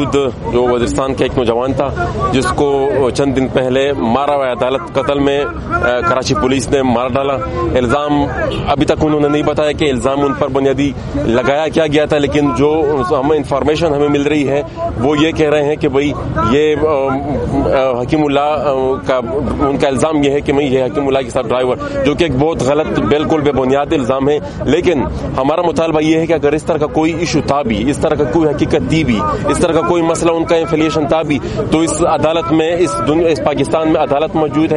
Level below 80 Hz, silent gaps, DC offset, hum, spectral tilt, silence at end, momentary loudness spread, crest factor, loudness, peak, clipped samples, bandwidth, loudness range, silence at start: -32 dBFS; none; under 0.1%; none; -6 dB/octave; 0 s; 3 LU; 14 dB; -14 LUFS; 0 dBFS; under 0.1%; 11.5 kHz; 1 LU; 0 s